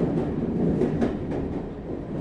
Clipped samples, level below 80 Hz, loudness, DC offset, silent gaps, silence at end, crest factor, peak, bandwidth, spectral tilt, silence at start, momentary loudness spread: under 0.1%; -42 dBFS; -27 LUFS; under 0.1%; none; 0 s; 16 dB; -10 dBFS; 9.2 kHz; -9.5 dB/octave; 0 s; 9 LU